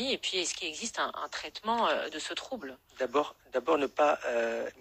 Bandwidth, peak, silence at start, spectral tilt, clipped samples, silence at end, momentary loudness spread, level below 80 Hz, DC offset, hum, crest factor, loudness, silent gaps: 15.5 kHz; -14 dBFS; 0 s; -1.5 dB/octave; under 0.1%; 0.1 s; 10 LU; -68 dBFS; under 0.1%; none; 18 dB; -31 LUFS; none